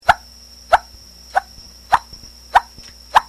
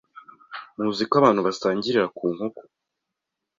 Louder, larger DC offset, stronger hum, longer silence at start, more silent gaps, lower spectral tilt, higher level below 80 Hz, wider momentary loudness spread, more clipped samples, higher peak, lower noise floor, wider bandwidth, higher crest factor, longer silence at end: first, -19 LUFS vs -23 LUFS; neither; neither; second, 0.05 s vs 0.5 s; neither; second, -2 dB/octave vs -5.5 dB/octave; first, -42 dBFS vs -64 dBFS; first, 22 LU vs 19 LU; neither; first, 0 dBFS vs -4 dBFS; second, -42 dBFS vs -84 dBFS; first, 14.5 kHz vs 7.6 kHz; about the same, 20 dB vs 22 dB; second, 0.05 s vs 0.95 s